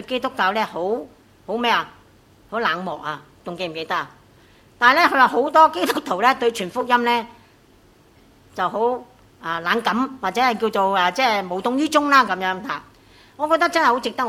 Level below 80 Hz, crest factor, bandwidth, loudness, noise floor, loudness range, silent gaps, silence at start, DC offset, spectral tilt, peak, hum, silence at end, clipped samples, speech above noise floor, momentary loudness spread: -62 dBFS; 20 dB; 16 kHz; -20 LUFS; -53 dBFS; 8 LU; none; 0 s; under 0.1%; -3.5 dB/octave; 0 dBFS; none; 0 s; under 0.1%; 33 dB; 15 LU